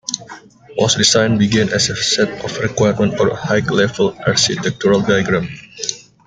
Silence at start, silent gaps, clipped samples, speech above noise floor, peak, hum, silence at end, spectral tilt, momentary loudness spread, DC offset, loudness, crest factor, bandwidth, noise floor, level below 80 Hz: 0.1 s; none; under 0.1%; 23 dB; 0 dBFS; none; 0.3 s; -4 dB/octave; 11 LU; under 0.1%; -15 LUFS; 16 dB; 9.6 kHz; -38 dBFS; -48 dBFS